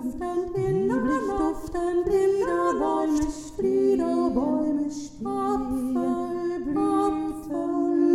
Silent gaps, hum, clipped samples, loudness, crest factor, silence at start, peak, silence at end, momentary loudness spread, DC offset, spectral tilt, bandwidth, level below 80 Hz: none; none; under 0.1%; -25 LUFS; 14 dB; 0 s; -10 dBFS; 0 s; 7 LU; under 0.1%; -7 dB/octave; 13.5 kHz; -46 dBFS